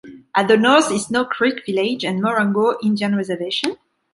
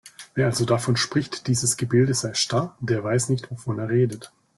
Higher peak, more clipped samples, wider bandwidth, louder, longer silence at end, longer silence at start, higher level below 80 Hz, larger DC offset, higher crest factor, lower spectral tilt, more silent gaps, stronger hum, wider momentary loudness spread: first, -2 dBFS vs -6 dBFS; neither; about the same, 11.5 kHz vs 12.5 kHz; first, -18 LUFS vs -23 LUFS; about the same, 0.4 s vs 0.3 s; about the same, 0.05 s vs 0.05 s; second, -64 dBFS vs -58 dBFS; neither; about the same, 16 dB vs 16 dB; about the same, -4.5 dB/octave vs -4.5 dB/octave; neither; neither; about the same, 8 LU vs 7 LU